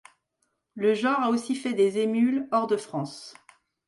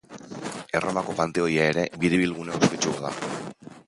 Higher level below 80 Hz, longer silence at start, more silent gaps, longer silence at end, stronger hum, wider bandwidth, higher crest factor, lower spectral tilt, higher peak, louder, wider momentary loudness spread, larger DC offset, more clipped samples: second, -74 dBFS vs -56 dBFS; first, 0.75 s vs 0.1 s; neither; first, 0.55 s vs 0.05 s; neither; about the same, 11.5 kHz vs 11.5 kHz; second, 14 dB vs 22 dB; about the same, -5.5 dB/octave vs -4.5 dB/octave; second, -12 dBFS vs -4 dBFS; about the same, -25 LUFS vs -25 LUFS; about the same, 11 LU vs 13 LU; neither; neither